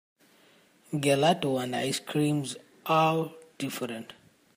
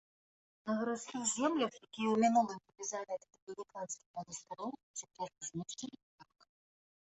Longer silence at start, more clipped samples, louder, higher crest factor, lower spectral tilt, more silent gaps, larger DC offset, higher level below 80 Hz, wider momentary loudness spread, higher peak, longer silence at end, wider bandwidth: first, 0.9 s vs 0.65 s; neither; first, -28 LUFS vs -38 LUFS; about the same, 18 dB vs 20 dB; first, -5 dB/octave vs -3.5 dB/octave; second, none vs 3.42-3.47 s, 4.06-4.14 s, 4.83-4.94 s, 6.03-6.18 s; neither; first, -72 dBFS vs -82 dBFS; about the same, 14 LU vs 16 LU; first, -12 dBFS vs -20 dBFS; second, 0.45 s vs 0.8 s; first, 15.5 kHz vs 8.2 kHz